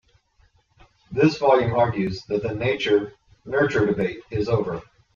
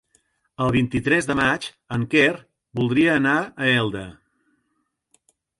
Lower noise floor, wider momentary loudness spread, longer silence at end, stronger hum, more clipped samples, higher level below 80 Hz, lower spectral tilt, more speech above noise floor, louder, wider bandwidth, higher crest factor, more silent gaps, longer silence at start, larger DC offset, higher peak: second, -61 dBFS vs -73 dBFS; about the same, 10 LU vs 12 LU; second, 0.3 s vs 1.45 s; neither; neither; about the same, -50 dBFS vs -50 dBFS; first, -7 dB/octave vs -5.5 dB/octave; second, 40 dB vs 53 dB; about the same, -22 LUFS vs -21 LUFS; second, 7.2 kHz vs 11.5 kHz; about the same, 20 dB vs 18 dB; neither; first, 1.1 s vs 0.6 s; neither; about the same, -4 dBFS vs -4 dBFS